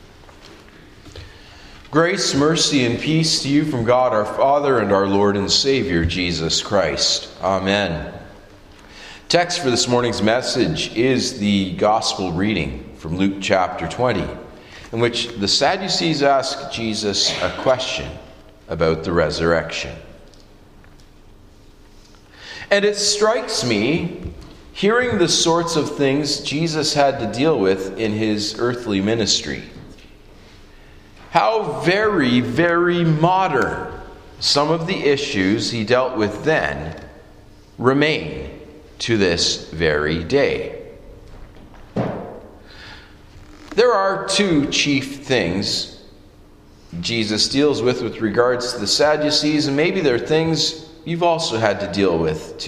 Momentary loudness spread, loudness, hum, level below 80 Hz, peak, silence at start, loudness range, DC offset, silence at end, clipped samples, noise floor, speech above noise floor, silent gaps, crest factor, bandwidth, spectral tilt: 14 LU; -18 LUFS; none; -44 dBFS; 0 dBFS; 0.05 s; 5 LU; under 0.1%; 0 s; under 0.1%; -46 dBFS; 27 dB; none; 18 dB; 14.5 kHz; -4 dB/octave